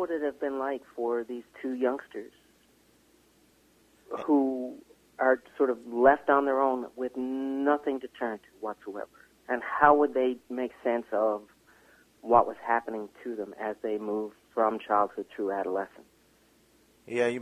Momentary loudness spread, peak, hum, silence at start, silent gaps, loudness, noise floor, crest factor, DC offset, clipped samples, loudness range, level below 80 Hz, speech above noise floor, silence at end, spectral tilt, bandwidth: 15 LU; -4 dBFS; none; 0 s; none; -29 LUFS; -63 dBFS; 24 dB; under 0.1%; under 0.1%; 7 LU; -70 dBFS; 35 dB; 0 s; -6 dB/octave; 14.5 kHz